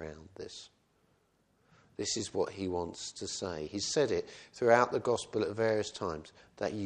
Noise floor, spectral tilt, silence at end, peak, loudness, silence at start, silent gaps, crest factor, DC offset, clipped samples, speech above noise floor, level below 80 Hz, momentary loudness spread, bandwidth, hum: -72 dBFS; -4 dB/octave; 0 s; -10 dBFS; -33 LUFS; 0 s; none; 24 dB; under 0.1%; under 0.1%; 39 dB; -64 dBFS; 19 LU; 10.5 kHz; none